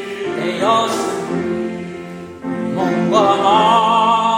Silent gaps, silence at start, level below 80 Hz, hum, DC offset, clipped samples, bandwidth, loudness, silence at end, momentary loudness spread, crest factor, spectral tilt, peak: none; 0 s; -58 dBFS; none; under 0.1%; under 0.1%; 16 kHz; -16 LUFS; 0 s; 16 LU; 16 dB; -5 dB/octave; -2 dBFS